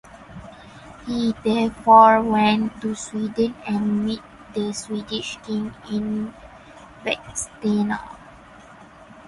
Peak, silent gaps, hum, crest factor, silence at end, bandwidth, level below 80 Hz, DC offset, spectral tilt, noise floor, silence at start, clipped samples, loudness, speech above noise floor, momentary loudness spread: 0 dBFS; none; none; 22 dB; 0.05 s; 11.5 kHz; -52 dBFS; under 0.1%; -5 dB/octave; -45 dBFS; 0.15 s; under 0.1%; -21 LUFS; 25 dB; 21 LU